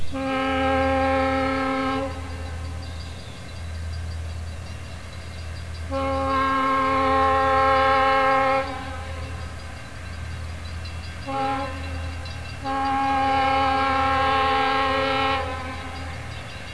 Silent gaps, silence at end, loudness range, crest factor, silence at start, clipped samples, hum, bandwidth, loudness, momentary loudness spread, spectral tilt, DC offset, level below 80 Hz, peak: none; 0 s; 11 LU; 16 dB; 0 s; under 0.1%; none; 11 kHz; -23 LUFS; 17 LU; -5.5 dB/octave; 0.8%; -38 dBFS; -8 dBFS